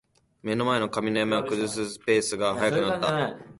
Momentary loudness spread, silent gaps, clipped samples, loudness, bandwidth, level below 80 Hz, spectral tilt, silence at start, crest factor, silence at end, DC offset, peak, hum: 6 LU; none; under 0.1%; -26 LUFS; 11.5 kHz; -60 dBFS; -4.5 dB/octave; 0.45 s; 16 dB; 0.05 s; under 0.1%; -10 dBFS; none